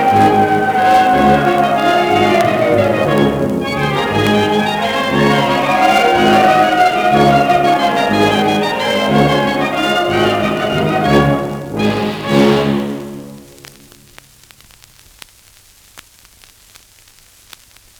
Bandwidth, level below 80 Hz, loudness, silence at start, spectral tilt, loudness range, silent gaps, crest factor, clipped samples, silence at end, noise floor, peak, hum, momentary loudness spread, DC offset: over 20 kHz; -40 dBFS; -13 LUFS; 0 s; -5.5 dB/octave; 7 LU; none; 14 dB; under 0.1%; 2 s; -46 dBFS; 0 dBFS; none; 6 LU; under 0.1%